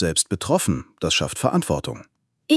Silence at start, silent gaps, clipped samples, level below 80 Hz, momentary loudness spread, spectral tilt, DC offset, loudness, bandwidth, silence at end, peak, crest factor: 0 s; none; under 0.1%; -48 dBFS; 7 LU; -4 dB/octave; under 0.1%; -22 LUFS; 12 kHz; 0 s; -4 dBFS; 20 dB